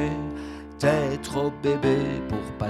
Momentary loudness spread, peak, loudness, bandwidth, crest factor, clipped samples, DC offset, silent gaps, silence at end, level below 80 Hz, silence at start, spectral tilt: 11 LU; -8 dBFS; -26 LUFS; 14 kHz; 18 dB; under 0.1%; under 0.1%; none; 0 s; -44 dBFS; 0 s; -6.5 dB/octave